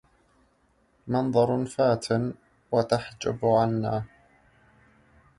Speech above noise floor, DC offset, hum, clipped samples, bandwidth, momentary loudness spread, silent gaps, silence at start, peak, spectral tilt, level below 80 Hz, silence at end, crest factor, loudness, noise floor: 41 dB; under 0.1%; none; under 0.1%; 11.5 kHz; 10 LU; none; 1.05 s; -8 dBFS; -6.5 dB/octave; -58 dBFS; 1.3 s; 18 dB; -26 LUFS; -66 dBFS